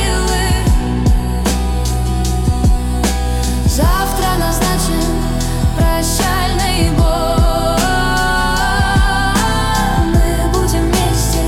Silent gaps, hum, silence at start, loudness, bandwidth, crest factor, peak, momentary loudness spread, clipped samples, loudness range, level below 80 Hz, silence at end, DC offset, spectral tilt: none; none; 0 s; -15 LUFS; 17 kHz; 10 dB; -4 dBFS; 3 LU; under 0.1%; 2 LU; -16 dBFS; 0 s; under 0.1%; -4.5 dB/octave